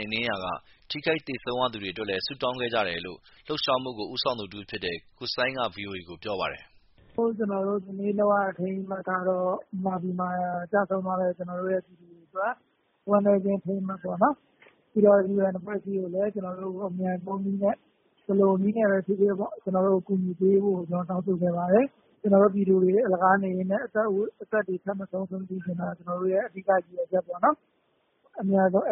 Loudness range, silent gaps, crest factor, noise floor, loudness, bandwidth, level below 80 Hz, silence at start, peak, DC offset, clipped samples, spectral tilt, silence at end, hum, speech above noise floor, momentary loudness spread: 6 LU; none; 20 dB; -70 dBFS; -27 LUFS; 5.8 kHz; -66 dBFS; 0 s; -8 dBFS; under 0.1%; under 0.1%; -4.5 dB/octave; 0 s; none; 44 dB; 11 LU